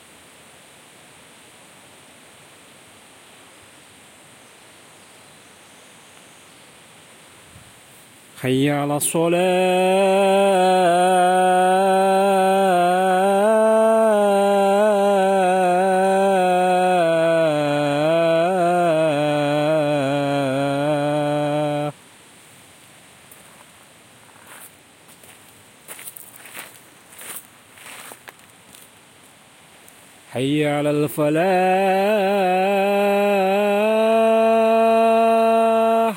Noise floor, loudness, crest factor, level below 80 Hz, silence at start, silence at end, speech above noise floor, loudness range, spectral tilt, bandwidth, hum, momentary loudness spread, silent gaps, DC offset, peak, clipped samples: -49 dBFS; -18 LUFS; 12 dB; -70 dBFS; 8.35 s; 0 s; 32 dB; 21 LU; -5 dB/octave; 16.5 kHz; none; 15 LU; none; under 0.1%; -6 dBFS; under 0.1%